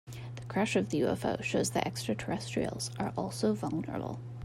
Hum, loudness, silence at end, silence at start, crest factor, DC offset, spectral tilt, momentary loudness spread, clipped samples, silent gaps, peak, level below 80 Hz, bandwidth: none; -33 LUFS; 0 s; 0.05 s; 18 dB; under 0.1%; -5 dB/octave; 8 LU; under 0.1%; none; -16 dBFS; -60 dBFS; 16 kHz